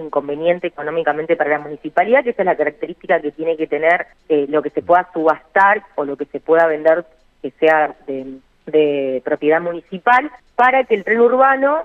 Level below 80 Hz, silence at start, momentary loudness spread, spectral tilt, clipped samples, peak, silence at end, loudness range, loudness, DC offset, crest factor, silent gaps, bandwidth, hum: -58 dBFS; 0 s; 11 LU; -7 dB/octave; under 0.1%; -2 dBFS; 0 s; 2 LU; -16 LUFS; under 0.1%; 14 dB; none; 5.8 kHz; none